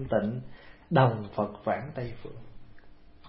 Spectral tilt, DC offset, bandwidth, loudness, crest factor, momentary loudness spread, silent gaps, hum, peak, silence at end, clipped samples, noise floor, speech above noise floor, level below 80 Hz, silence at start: -11.5 dB/octave; under 0.1%; 5.6 kHz; -29 LUFS; 24 dB; 22 LU; none; none; -8 dBFS; 0 s; under 0.1%; -50 dBFS; 20 dB; -54 dBFS; 0 s